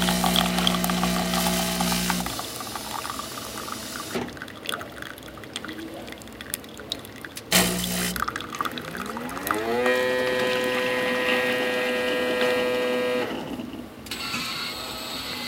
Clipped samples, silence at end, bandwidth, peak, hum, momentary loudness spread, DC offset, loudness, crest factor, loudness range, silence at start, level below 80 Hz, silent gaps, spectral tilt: under 0.1%; 0 s; 17 kHz; -2 dBFS; none; 13 LU; under 0.1%; -26 LUFS; 24 dB; 10 LU; 0 s; -48 dBFS; none; -3 dB/octave